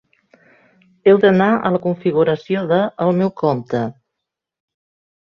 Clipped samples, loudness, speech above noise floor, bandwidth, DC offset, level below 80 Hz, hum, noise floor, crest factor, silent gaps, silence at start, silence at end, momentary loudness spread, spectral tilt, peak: under 0.1%; -17 LUFS; 65 dB; 6.4 kHz; under 0.1%; -60 dBFS; none; -81 dBFS; 18 dB; none; 1.05 s; 1.3 s; 9 LU; -9 dB/octave; -2 dBFS